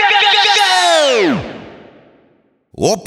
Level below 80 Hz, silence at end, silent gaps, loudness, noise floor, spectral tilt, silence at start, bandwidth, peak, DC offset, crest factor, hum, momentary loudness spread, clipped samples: -50 dBFS; 0 s; none; -11 LUFS; -55 dBFS; -2 dB/octave; 0 s; 17.5 kHz; 0 dBFS; under 0.1%; 14 dB; none; 15 LU; under 0.1%